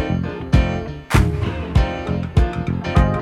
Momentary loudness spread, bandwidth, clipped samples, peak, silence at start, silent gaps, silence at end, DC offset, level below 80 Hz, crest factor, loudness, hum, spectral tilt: 6 LU; 14 kHz; under 0.1%; 0 dBFS; 0 s; none; 0 s; under 0.1%; -22 dBFS; 18 dB; -20 LUFS; none; -7 dB/octave